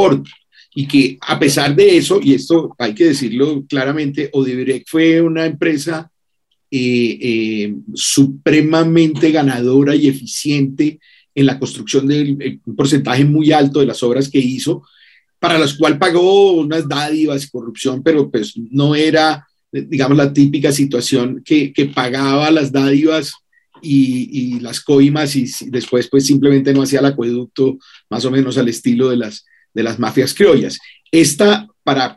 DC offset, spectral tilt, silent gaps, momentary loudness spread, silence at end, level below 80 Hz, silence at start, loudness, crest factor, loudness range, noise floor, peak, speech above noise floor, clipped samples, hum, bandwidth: under 0.1%; -5.5 dB/octave; none; 10 LU; 0.05 s; -56 dBFS; 0 s; -14 LUFS; 14 dB; 3 LU; -70 dBFS; 0 dBFS; 56 dB; under 0.1%; none; 12.5 kHz